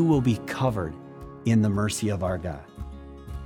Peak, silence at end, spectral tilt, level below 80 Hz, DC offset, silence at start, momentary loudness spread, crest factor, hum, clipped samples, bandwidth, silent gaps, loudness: -10 dBFS; 0 s; -6.5 dB/octave; -44 dBFS; under 0.1%; 0 s; 18 LU; 16 dB; none; under 0.1%; 17 kHz; none; -26 LUFS